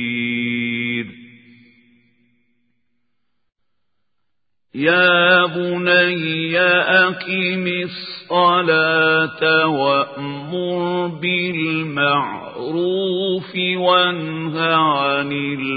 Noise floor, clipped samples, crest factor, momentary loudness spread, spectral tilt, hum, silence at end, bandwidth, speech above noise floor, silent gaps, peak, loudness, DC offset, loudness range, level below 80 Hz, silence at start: -80 dBFS; under 0.1%; 18 dB; 11 LU; -10 dB/octave; none; 0 s; 5 kHz; 62 dB; none; 0 dBFS; -17 LUFS; under 0.1%; 8 LU; -66 dBFS; 0 s